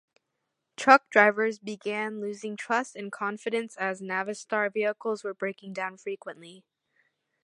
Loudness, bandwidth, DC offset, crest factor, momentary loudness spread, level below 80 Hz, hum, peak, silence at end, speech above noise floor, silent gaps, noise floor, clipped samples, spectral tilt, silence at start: -27 LUFS; 11 kHz; under 0.1%; 26 dB; 17 LU; -84 dBFS; none; -2 dBFS; 0.85 s; 54 dB; none; -82 dBFS; under 0.1%; -4 dB/octave; 0.8 s